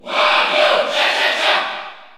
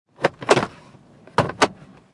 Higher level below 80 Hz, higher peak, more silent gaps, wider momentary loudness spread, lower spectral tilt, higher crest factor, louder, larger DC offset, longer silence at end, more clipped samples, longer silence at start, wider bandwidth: second, -70 dBFS vs -58 dBFS; about the same, -2 dBFS vs -2 dBFS; neither; about the same, 7 LU vs 6 LU; second, -0.5 dB/octave vs -4 dB/octave; second, 16 dB vs 22 dB; first, -15 LUFS vs -22 LUFS; neither; second, 0.1 s vs 0.4 s; neither; second, 0.05 s vs 0.2 s; first, 15.5 kHz vs 11.5 kHz